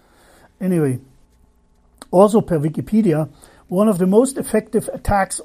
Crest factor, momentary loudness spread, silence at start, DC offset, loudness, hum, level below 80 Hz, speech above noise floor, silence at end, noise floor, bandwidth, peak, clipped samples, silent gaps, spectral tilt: 18 dB; 9 LU; 0.6 s; under 0.1%; -18 LUFS; 60 Hz at -40 dBFS; -40 dBFS; 38 dB; 0 s; -55 dBFS; 15.5 kHz; 0 dBFS; under 0.1%; none; -7 dB/octave